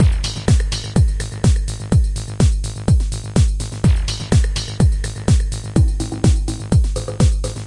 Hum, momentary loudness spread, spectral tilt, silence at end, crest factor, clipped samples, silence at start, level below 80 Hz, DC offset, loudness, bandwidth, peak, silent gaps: none; 3 LU; -6 dB/octave; 0 s; 16 dB; under 0.1%; 0 s; -20 dBFS; under 0.1%; -18 LUFS; 11.5 kHz; 0 dBFS; none